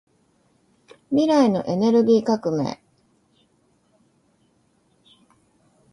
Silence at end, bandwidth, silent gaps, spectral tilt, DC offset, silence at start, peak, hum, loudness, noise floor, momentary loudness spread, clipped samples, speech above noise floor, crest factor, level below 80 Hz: 3.2 s; 10.5 kHz; none; -7 dB/octave; under 0.1%; 1.1 s; -6 dBFS; none; -20 LUFS; -64 dBFS; 10 LU; under 0.1%; 45 dB; 18 dB; -66 dBFS